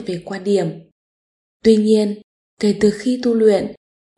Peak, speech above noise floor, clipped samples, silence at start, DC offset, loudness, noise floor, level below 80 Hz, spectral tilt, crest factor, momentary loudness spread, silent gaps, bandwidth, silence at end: -2 dBFS; over 74 dB; under 0.1%; 0 s; under 0.1%; -17 LUFS; under -90 dBFS; -54 dBFS; -6.5 dB/octave; 16 dB; 12 LU; 0.92-1.60 s, 2.24-2.57 s; 11.5 kHz; 0.45 s